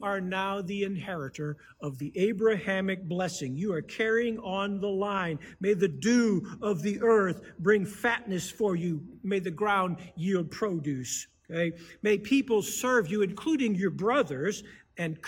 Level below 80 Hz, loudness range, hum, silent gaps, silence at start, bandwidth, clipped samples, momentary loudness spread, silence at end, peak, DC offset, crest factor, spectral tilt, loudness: -64 dBFS; 4 LU; none; none; 0 s; 17 kHz; under 0.1%; 10 LU; 0 s; -10 dBFS; under 0.1%; 18 dB; -5 dB/octave; -29 LUFS